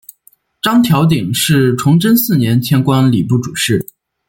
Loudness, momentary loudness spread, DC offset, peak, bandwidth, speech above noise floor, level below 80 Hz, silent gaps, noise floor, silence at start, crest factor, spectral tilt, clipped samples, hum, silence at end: -12 LUFS; 5 LU; under 0.1%; 0 dBFS; 17 kHz; 40 dB; -48 dBFS; none; -51 dBFS; 0.65 s; 12 dB; -5.5 dB/octave; under 0.1%; none; 0.45 s